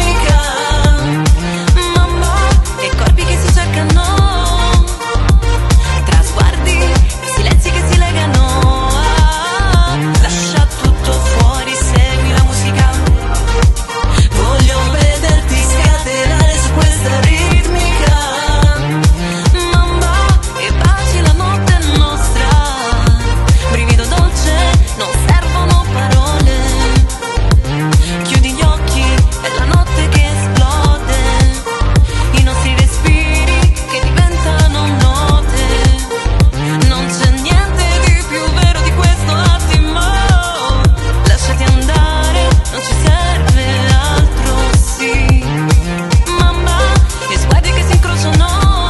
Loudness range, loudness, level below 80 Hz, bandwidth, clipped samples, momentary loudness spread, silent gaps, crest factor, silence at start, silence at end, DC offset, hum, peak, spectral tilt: 1 LU; -12 LUFS; -12 dBFS; 12.5 kHz; under 0.1%; 2 LU; none; 10 dB; 0 s; 0 s; under 0.1%; none; 0 dBFS; -5 dB/octave